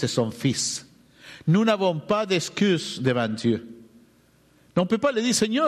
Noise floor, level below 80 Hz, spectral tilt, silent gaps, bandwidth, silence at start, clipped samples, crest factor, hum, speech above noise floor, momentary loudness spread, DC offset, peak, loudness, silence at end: -59 dBFS; -62 dBFS; -4.5 dB/octave; none; 13.5 kHz; 0 s; under 0.1%; 14 dB; none; 36 dB; 6 LU; under 0.1%; -10 dBFS; -24 LUFS; 0 s